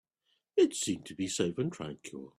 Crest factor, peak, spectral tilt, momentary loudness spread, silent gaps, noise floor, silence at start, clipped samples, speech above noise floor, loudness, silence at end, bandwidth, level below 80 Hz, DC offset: 18 dB; -14 dBFS; -4.5 dB/octave; 14 LU; none; -78 dBFS; 0.55 s; under 0.1%; 46 dB; -32 LUFS; 0.1 s; 14.5 kHz; -70 dBFS; under 0.1%